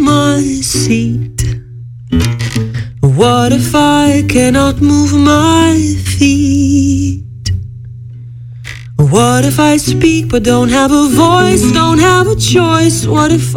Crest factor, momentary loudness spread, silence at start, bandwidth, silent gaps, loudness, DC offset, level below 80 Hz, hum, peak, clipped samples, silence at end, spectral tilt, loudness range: 10 dB; 13 LU; 0 s; 17 kHz; none; -10 LUFS; under 0.1%; -28 dBFS; none; 0 dBFS; 0.3%; 0 s; -5 dB/octave; 5 LU